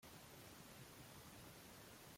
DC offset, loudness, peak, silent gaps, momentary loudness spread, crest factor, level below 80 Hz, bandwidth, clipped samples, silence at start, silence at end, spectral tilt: under 0.1%; -59 LUFS; -46 dBFS; none; 1 LU; 14 dB; -76 dBFS; 16.5 kHz; under 0.1%; 0 s; 0 s; -3.5 dB/octave